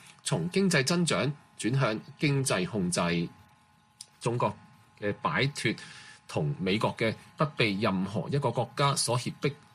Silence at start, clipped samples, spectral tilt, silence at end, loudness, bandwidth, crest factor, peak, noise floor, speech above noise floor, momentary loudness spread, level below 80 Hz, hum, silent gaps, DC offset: 0.05 s; under 0.1%; -4.5 dB/octave; 0.2 s; -29 LUFS; 14.5 kHz; 20 dB; -10 dBFS; -62 dBFS; 34 dB; 10 LU; -64 dBFS; none; none; under 0.1%